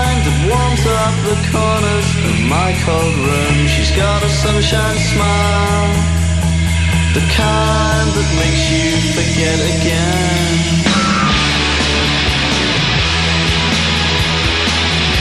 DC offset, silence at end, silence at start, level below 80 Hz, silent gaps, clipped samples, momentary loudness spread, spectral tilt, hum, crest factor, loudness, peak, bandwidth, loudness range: under 0.1%; 0 s; 0 s; -22 dBFS; none; under 0.1%; 2 LU; -4.5 dB/octave; none; 12 dB; -13 LUFS; -2 dBFS; 13.5 kHz; 1 LU